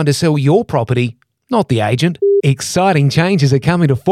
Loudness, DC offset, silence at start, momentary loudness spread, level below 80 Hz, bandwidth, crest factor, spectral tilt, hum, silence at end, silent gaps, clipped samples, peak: -14 LUFS; under 0.1%; 0 s; 5 LU; -48 dBFS; 13.5 kHz; 12 dB; -6 dB/octave; none; 0 s; none; under 0.1%; -2 dBFS